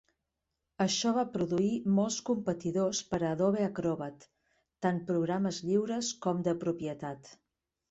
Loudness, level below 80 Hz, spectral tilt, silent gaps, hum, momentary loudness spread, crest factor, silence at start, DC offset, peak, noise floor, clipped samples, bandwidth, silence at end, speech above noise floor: -32 LUFS; -66 dBFS; -5 dB/octave; none; none; 7 LU; 16 dB; 0.8 s; under 0.1%; -16 dBFS; -86 dBFS; under 0.1%; 8.2 kHz; 0.55 s; 54 dB